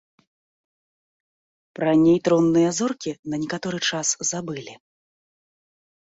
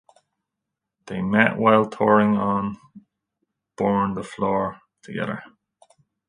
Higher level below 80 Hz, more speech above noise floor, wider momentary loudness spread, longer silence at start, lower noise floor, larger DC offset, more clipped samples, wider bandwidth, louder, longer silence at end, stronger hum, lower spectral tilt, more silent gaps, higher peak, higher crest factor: about the same, -62 dBFS vs -58 dBFS; first, over 69 dB vs 62 dB; about the same, 13 LU vs 15 LU; first, 1.8 s vs 1.05 s; first, under -90 dBFS vs -83 dBFS; neither; neither; second, 8 kHz vs 10.5 kHz; about the same, -21 LUFS vs -21 LUFS; first, 1.3 s vs 0.8 s; neither; second, -4 dB/octave vs -7.5 dB/octave; first, 3.19-3.23 s vs none; second, -8 dBFS vs 0 dBFS; second, 16 dB vs 22 dB